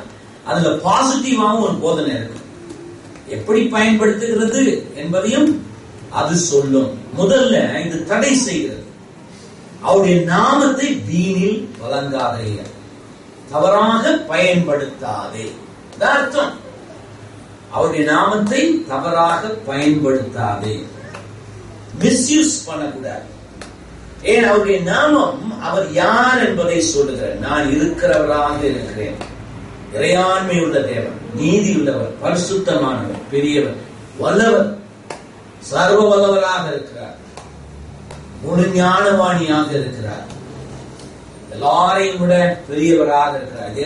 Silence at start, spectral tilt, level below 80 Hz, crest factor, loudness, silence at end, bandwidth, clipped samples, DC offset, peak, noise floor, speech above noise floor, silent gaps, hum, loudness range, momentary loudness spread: 0 s; -4.5 dB/octave; -46 dBFS; 16 dB; -16 LUFS; 0 s; 11.5 kHz; under 0.1%; under 0.1%; -2 dBFS; -38 dBFS; 23 dB; none; none; 3 LU; 21 LU